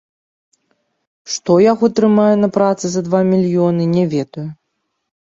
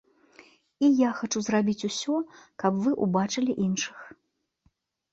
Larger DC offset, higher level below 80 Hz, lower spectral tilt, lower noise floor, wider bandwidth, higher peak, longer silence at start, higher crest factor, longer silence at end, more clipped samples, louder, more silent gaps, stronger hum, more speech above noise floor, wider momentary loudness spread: neither; first, -58 dBFS vs -68 dBFS; first, -6.5 dB/octave vs -5 dB/octave; second, -72 dBFS vs -77 dBFS; about the same, 7.8 kHz vs 8 kHz; first, -2 dBFS vs -10 dBFS; first, 1.25 s vs 0.8 s; about the same, 14 dB vs 18 dB; second, 0.7 s vs 1.05 s; neither; first, -14 LUFS vs -26 LUFS; neither; neither; first, 58 dB vs 51 dB; first, 12 LU vs 8 LU